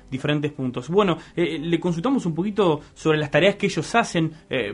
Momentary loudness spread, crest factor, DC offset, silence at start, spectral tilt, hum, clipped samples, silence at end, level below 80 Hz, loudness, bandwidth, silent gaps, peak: 6 LU; 18 dB; under 0.1%; 0.1 s; -6 dB/octave; none; under 0.1%; 0 s; -52 dBFS; -22 LUFS; 11 kHz; none; -4 dBFS